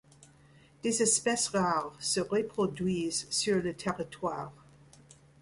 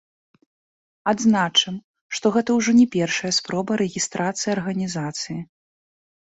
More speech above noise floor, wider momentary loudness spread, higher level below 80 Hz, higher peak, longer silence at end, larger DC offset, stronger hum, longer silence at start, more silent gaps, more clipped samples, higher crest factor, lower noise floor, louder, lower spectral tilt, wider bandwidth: second, 29 dB vs over 69 dB; about the same, 10 LU vs 12 LU; about the same, -64 dBFS vs -62 dBFS; second, -14 dBFS vs -4 dBFS; about the same, 0.9 s vs 0.85 s; neither; neither; second, 0.2 s vs 1.05 s; second, none vs 1.84-1.94 s, 2.01-2.09 s; neither; about the same, 18 dB vs 18 dB; second, -59 dBFS vs under -90 dBFS; second, -30 LUFS vs -21 LUFS; about the same, -3.5 dB/octave vs -4 dB/octave; first, 11.5 kHz vs 8.2 kHz